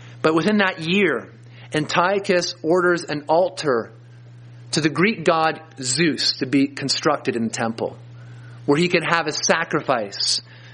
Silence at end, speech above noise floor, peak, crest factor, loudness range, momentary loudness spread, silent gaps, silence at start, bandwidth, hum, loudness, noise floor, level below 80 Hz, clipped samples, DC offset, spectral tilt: 0 s; 22 dB; 0 dBFS; 20 dB; 2 LU; 9 LU; none; 0 s; 10 kHz; none; -20 LUFS; -43 dBFS; -64 dBFS; under 0.1%; under 0.1%; -4 dB/octave